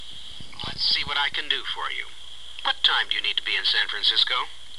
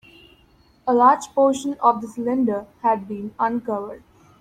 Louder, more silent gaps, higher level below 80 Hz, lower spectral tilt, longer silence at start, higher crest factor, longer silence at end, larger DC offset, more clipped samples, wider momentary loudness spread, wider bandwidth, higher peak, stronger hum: about the same, -22 LUFS vs -21 LUFS; neither; first, -54 dBFS vs -60 dBFS; second, -0.5 dB/octave vs -5.5 dB/octave; second, 0 s vs 0.85 s; about the same, 20 dB vs 18 dB; second, 0 s vs 0.45 s; first, 2% vs under 0.1%; neither; first, 18 LU vs 13 LU; second, 12.5 kHz vs 14.5 kHz; about the same, -6 dBFS vs -4 dBFS; neither